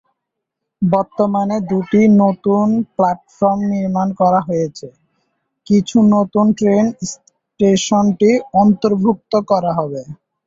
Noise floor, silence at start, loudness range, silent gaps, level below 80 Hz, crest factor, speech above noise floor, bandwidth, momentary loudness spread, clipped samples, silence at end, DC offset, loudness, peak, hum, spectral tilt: -78 dBFS; 0.8 s; 3 LU; none; -54 dBFS; 14 dB; 64 dB; 7.8 kHz; 8 LU; under 0.1%; 0.3 s; under 0.1%; -15 LUFS; -2 dBFS; none; -6.5 dB/octave